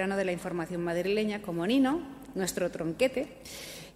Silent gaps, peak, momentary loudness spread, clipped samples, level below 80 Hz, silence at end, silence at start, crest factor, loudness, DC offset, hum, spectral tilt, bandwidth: none; -12 dBFS; 13 LU; under 0.1%; -60 dBFS; 0.05 s; 0 s; 18 dB; -31 LUFS; under 0.1%; none; -5 dB/octave; 16 kHz